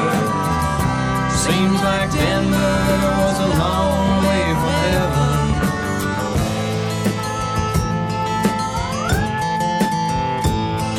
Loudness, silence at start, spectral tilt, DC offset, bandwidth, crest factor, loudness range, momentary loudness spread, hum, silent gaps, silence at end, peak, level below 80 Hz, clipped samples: -19 LUFS; 0 s; -5.5 dB/octave; under 0.1%; 16.5 kHz; 14 dB; 3 LU; 4 LU; none; none; 0 s; -4 dBFS; -30 dBFS; under 0.1%